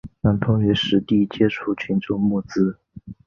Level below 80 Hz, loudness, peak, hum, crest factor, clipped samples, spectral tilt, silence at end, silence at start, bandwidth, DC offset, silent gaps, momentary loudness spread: -44 dBFS; -21 LUFS; -4 dBFS; none; 16 dB; under 0.1%; -7.5 dB/octave; 0.15 s; 0.05 s; 7 kHz; under 0.1%; none; 6 LU